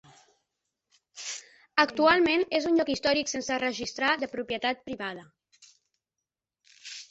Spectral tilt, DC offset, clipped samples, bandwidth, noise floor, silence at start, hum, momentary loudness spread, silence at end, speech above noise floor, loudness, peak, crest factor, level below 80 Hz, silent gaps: -2.5 dB/octave; under 0.1%; under 0.1%; 8.2 kHz; -88 dBFS; 1.15 s; none; 18 LU; 0.05 s; 62 dB; -27 LUFS; -6 dBFS; 24 dB; -64 dBFS; none